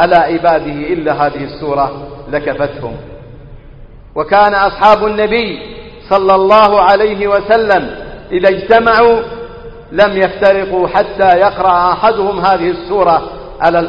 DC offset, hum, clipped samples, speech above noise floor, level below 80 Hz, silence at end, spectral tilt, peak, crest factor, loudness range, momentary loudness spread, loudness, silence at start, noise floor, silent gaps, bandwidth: under 0.1%; none; 0.1%; 23 dB; -36 dBFS; 0 s; -7 dB/octave; 0 dBFS; 12 dB; 6 LU; 16 LU; -11 LUFS; 0 s; -34 dBFS; none; 6.8 kHz